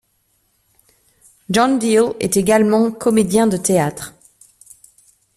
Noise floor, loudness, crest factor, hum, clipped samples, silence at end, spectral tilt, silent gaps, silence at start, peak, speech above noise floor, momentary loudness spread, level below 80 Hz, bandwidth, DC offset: -64 dBFS; -16 LUFS; 16 dB; none; under 0.1%; 1.3 s; -5 dB/octave; none; 1.5 s; -2 dBFS; 48 dB; 7 LU; -52 dBFS; 14.5 kHz; under 0.1%